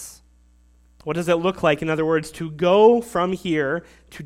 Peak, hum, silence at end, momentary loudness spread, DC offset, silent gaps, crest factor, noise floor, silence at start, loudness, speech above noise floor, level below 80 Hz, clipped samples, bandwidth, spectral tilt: -2 dBFS; 60 Hz at -45 dBFS; 0 s; 14 LU; under 0.1%; none; 18 dB; -55 dBFS; 0 s; -20 LUFS; 35 dB; -52 dBFS; under 0.1%; 15 kHz; -6 dB/octave